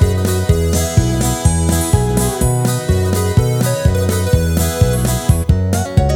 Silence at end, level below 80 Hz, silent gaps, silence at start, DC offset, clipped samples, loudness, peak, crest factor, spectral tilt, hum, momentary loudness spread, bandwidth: 0 s; -22 dBFS; none; 0 s; under 0.1%; under 0.1%; -15 LUFS; 0 dBFS; 14 dB; -5.5 dB/octave; none; 2 LU; 18.5 kHz